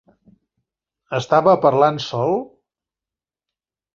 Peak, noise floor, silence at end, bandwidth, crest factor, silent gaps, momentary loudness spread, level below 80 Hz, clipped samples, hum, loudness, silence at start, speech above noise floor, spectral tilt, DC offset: -2 dBFS; -90 dBFS; 1.5 s; 7.6 kHz; 20 dB; none; 11 LU; -62 dBFS; under 0.1%; none; -18 LUFS; 1.1 s; 73 dB; -6.5 dB/octave; under 0.1%